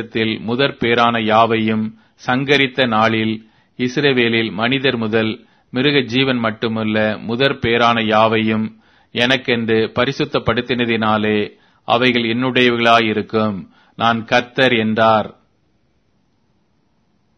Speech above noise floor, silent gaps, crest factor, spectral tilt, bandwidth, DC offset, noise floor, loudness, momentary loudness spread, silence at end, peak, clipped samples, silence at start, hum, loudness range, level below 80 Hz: 46 dB; none; 18 dB; -6 dB/octave; 6.6 kHz; under 0.1%; -62 dBFS; -16 LUFS; 8 LU; 2.05 s; 0 dBFS; under 0.1%; 0 s; none; 2 LU; -52 dBFS